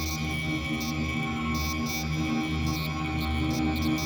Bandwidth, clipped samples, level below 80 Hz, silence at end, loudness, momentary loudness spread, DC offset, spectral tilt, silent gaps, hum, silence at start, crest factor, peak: over 20 kHz; under 0.1%; -38 dBFS; 0 s; -29 LUFS; 2 LU; under 0.1%; -5 dB/octave; none; none; 0 s; 12 dB; -16 dBFS